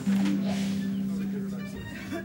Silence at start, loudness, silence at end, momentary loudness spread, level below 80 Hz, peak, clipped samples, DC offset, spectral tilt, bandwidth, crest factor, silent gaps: 0 s; -30 LUFS; 0 s; 10 LU; -56 dBFS; -16 dBFS; under 0.1%; under 0.1%; -6.5 dB/octave; 16.5 kHz; 12 dB; none